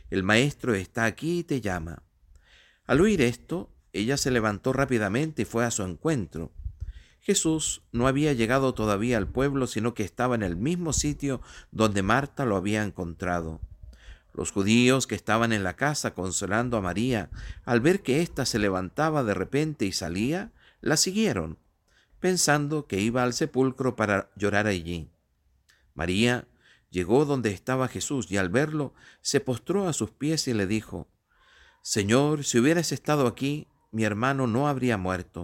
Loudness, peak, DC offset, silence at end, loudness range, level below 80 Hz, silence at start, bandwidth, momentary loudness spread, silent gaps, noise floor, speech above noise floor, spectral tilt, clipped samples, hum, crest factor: -26 LUFS; -6 dBFS; under 0.1%; 0 s; 2 LU; -48 dBFS; 0.05 s; 16.5 kHz; 12 LU; none; -68 dBFS; 42 dB; -4.5 dB/octave; under 0.1%; none; 20 dB